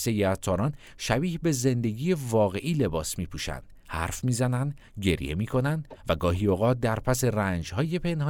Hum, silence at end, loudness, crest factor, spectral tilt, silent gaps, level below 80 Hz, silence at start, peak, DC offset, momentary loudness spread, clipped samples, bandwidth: none; 0 s; -27 LUFS; 20 dB; -5.5 dB/octave; none; -44 dBFS; 0 s; -8 dBFS; under 0.1%; 8 LU; under 0.1%; 18 kHz